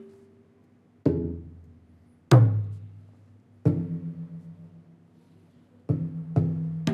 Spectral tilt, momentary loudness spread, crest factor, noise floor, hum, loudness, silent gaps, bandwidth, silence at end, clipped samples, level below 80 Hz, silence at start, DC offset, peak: -8.5 dB/octave; 26 LU; 24 dB; -59 dBFS; none; -26 LUFS; none; 8.8 kHz; 0 s; under 0.1%; -54 dBFS; 0 s; under 0.1%; -4 dBFS